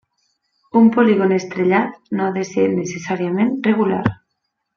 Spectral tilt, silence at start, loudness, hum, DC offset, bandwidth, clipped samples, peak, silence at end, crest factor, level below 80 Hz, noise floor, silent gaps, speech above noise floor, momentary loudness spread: -7 dB/octave; 0.75 s; -18 LUFS; none; under 0.1%; 7 kHz; under 0.1%; 0 dBFS; 0.65 s; 18 dB; -56 dBFS; -74 dBFS; none; 58 dB; 9 LU